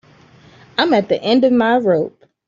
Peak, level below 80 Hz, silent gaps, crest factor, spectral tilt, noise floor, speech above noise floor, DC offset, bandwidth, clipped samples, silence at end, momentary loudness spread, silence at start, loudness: -2 dBFS; -60 dBFS; none; 14 dB; -6.5 dB/octave; -47 dBFS; 32 dB; under 0.1%; 7.4 kHz; under 0.1%; 0.4 s; 8 LU; 0.8 s; -15 LUFS